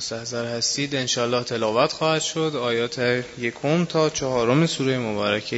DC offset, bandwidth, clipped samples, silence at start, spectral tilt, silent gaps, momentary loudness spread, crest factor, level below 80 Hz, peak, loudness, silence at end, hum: under 0.1%; 8 kHz; under 0.1%; 0 s; -4 dB/octave; none; 5 LU; 18 dB; -58 dBFS; -4 dBFS; -23 LUFS; 0 s; none